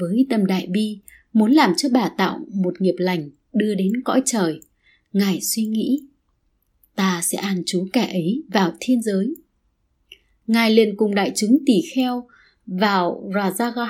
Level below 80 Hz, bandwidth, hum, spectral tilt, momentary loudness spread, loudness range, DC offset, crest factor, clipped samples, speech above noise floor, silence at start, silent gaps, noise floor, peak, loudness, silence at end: -66 dBFS; 16.5 kHz; none; -5 dB/octave; 9 LU; 4 LU; under 0.1%; 20 dB; under 0.1%; 47 dB; 0 s; none; -67 dBFS; 0 dBFS; -20 LUFS; 0 s